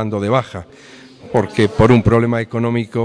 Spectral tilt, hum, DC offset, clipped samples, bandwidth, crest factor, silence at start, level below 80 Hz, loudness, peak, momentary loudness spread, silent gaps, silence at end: -7.5 dB/octave; none; under 0.1%; under 0.1%; 10.5 kHz; 14 dB; 0 s; -36 dBFS; -15 LUFS; -2 dBFS; 9 LU; none; 0 s